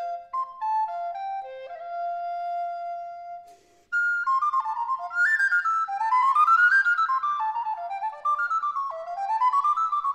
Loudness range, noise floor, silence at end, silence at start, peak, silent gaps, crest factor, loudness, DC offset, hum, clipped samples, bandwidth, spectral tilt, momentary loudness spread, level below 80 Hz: 10 LU; -53 dBFS; 0 s; 0 s; -12 dBFS; none; 14 dB; -24 LUFS; under 0.1%; none; under 0.1%; 14.5 kHz; 0.5 dB/octave; 15 LU; -76 dBFS